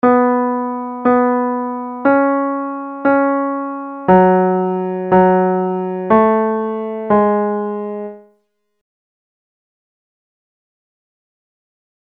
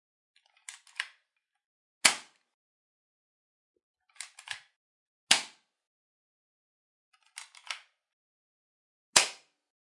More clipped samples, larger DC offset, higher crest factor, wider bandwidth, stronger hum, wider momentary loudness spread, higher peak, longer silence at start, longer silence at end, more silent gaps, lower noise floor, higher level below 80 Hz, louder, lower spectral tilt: neither; neither; second, 16 dB vs 36 dB; second, 4.2 kHz vs 11.5 kHz; neither; second, 11 LU vs 23 LU; about the same, 0 dBFS vs 0 dBFS; second, 0.05 s vs 0.7 s; first, 3.9 s vs 0.5 s; second, none vs 1.66-2.01 s, 2.54-3.74 s, 3.83-3.94 s, 4.76-5.27 s, 5.87-7.12 s, 8.13-9.13 s; second, -64 dBFS vs -79 dBFS; first, -54 dBFS vs -86 dBFS; first, -16 LUFS vs -27 LUFS; first, -11 dB/octave vs 1.5 dB/octave